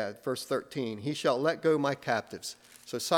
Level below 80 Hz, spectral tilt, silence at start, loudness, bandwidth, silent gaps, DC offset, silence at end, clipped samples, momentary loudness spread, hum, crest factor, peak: -76 dBFS; -4.5 dB/octave; 0 s; -31 LUFS; 18 kHz; none; under 0.1%; 0 s; under 0.1%; 13 LU; none; 22 dB; -10 dBFS